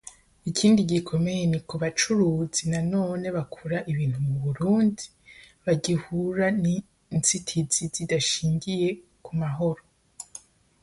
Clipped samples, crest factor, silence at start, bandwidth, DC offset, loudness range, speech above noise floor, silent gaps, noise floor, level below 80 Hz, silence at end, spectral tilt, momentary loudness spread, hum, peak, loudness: under 0.1%; 18 dB; 0.05 s; 11.5 kHz; under 0.1%; 3 LU; 28 dB; none; -52 dBFS; -56 dBFS; 0.45 s; -5 dB/octave; 14 LU; none; -8 dBFS; -25 LUFS